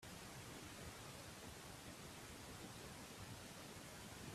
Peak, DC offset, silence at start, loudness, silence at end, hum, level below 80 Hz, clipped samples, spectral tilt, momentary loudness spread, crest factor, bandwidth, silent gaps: -40 dBFS; under 0.1%; 0 s; -54 LUFS; 0 s; none; -70 dBFS; under 0.1%; -3.5 dB/octave; 1 LU; 16 dB; 15.5 kHz; none